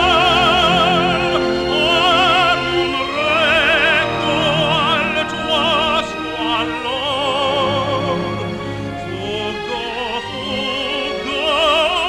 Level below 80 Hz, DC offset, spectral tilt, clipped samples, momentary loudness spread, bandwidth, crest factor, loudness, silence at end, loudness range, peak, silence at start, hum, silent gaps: -40 dBFS; under 0.1%; -4 dB/octave; under 0.1%; 10 LU; 16.5 kHz; 16 dB; -16 LUFS; 0 s; 7 LU; -2 dBFS; 0 s; none; none